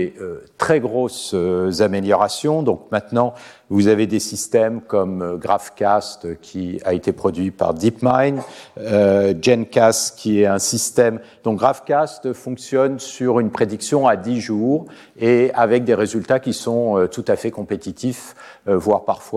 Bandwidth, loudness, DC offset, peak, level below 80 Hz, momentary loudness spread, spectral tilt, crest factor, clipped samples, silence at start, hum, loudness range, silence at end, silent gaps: 15 kHz; -19 LUFS; under 0.1%; 0 dBFS; -56 dBFS; 10 LU; -5 dB/octave; 18 dB; under 0.1%; 0 s; none; 4 LU; 0 s; none